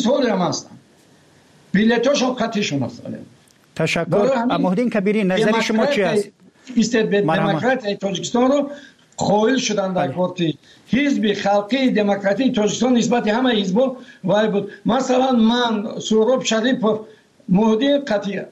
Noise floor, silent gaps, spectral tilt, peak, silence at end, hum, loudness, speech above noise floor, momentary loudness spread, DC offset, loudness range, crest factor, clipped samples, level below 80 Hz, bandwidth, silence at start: -52 dBFS; none; -5 dB/octave; -8 dBFS; 0 s; none; -19 LUFS; 34 dB; 7 LU; under 0.1%; 2 LU; 12 dB; under 0.1%; -58 dBFS; 11 kHz; 0 s